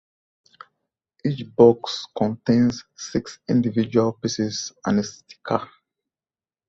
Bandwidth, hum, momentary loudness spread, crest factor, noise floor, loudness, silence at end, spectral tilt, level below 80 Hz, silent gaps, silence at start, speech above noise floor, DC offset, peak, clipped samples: 7.8 kHz; none; 13 LU; 22 dB; under -90 dBFS; -22 LUFS; 1.05 s; -6 dB/octave; -58 dBFS; none; 1.25 s; over 68 dB; under 0.1%; -2 dBFS; under 0.1%